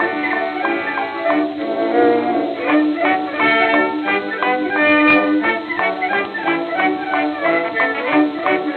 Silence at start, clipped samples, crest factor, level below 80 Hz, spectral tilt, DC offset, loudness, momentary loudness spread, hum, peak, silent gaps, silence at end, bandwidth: 0 s; under 0.1%; 14 dB; -62 dBFS; -7 dB/octave; under 0.1%; -17 LUFS; 6 LU; none; -4 dBFS; none; 0 s; 4.7 kHz